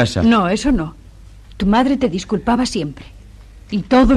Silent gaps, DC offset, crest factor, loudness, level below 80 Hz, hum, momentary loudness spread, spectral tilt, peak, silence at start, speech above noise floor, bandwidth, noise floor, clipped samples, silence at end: none; under 0.1%; 14 dB; -17 LUFS; -30 dBFS; none; 12 LU; -6 dB/octave; -4 dBFS; 0 s; 25 dB; 11.5 kHz; -40 dBFS; under 0.1%; 0 s